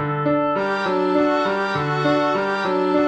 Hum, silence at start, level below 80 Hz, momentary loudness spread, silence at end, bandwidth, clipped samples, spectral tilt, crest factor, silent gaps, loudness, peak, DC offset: none; 0 s; -56 dBFS; 3 LU; 0 s; 8.6 kHz; under 0.1%; -7 dB/octave; 12 dB; none; -20 LUFS; -6 dBFS; under 0.1%